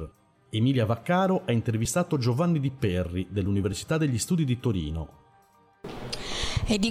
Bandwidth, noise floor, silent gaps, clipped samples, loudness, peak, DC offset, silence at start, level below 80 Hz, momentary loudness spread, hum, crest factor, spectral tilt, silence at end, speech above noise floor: 15.5 kHz; -60 dBFS; none; under 0.1%; -27 LUFS; -14 dBFS; under 0.1%; 0 s; -44 dBFS; 11 LU; none; 12 dB; -5.5 dB/octave; 0 s; 34 dB